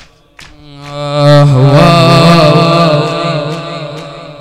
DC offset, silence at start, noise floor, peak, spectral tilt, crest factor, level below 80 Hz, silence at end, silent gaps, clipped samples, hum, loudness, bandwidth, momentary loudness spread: under 0.1%; 0.4 s; -37 dBFS; 0 dBFS; -6.5 dB/octave; 8 dB; -38 dBFS; 0.05 s; none; 2%; none; -7 LUFS; 13 kHz; 18 LU